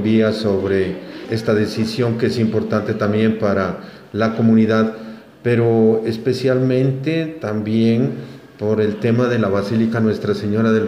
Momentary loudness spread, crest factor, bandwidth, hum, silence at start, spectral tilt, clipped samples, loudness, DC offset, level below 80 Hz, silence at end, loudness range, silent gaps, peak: 10 LU; 14 dB; 11.5 kHz; none; 0 s; -8 dB/octave; under 0.1%; -18 LUFS; under 0.1%; -56 dBFS; 0 s; 2 LU; none; -2 dBFS